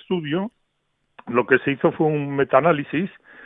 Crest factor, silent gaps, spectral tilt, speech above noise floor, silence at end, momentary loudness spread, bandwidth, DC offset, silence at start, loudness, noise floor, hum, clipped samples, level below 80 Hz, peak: 20 dB; none; -10.5 dB/octave; 51 dB; 0 s; 9 LU; 3.9 kHz; under 0.1%; 0.1 s; -21 LUFS; -71 dBFS; none; under 0.1%; -62 dBFS; -2 dBFS